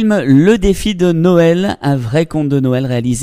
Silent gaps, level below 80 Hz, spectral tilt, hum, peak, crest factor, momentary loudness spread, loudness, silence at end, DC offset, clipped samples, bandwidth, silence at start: none; -30 dBFS; -6.5 dB/octave; none; 0 dBFS; 12 dB; 6 LU; -12 LUFS; 0 s; under 0.1%; under 0.1%; 16 kHz; 0 s